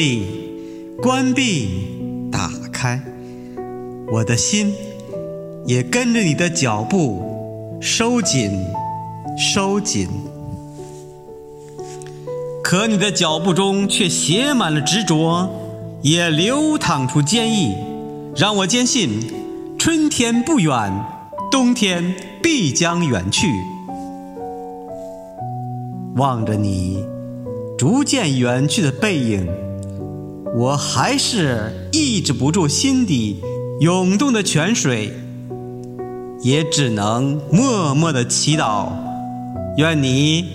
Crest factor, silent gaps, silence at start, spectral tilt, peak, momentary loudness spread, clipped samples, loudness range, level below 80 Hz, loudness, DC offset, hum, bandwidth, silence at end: 18 dB; none; 0 s; -4 dB/octave; 0 dBFS; 15 LU; under 0.1%; 6 LU; -50 dBFS; -18 LUFS; under 0.1%; none; 15.5 kHz; 0 s